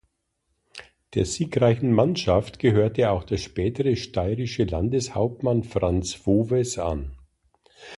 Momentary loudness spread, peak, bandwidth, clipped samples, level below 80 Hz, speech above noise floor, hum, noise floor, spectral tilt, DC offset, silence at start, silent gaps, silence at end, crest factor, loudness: 9 LU; -6 dBFS; 11.5 kHz; under 0.1%; -40 dBFS; 52 dB; none; -75 dBFS; -6.5 dB/octave; under 0.1%; 0.75 s; none; 0.05 s; 18 dB; -24 LUFS